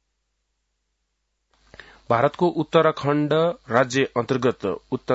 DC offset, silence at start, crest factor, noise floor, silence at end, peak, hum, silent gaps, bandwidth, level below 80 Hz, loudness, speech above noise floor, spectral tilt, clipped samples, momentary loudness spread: under 0.1%; 2.1 s; 20 dB; -75 dBFS; 0 s; -2 dBFS; none; none; 8 kHz; -60 dBFS; -22 LUFS; 54 dB; -6 dB/octave; under 0.1%; 5 LU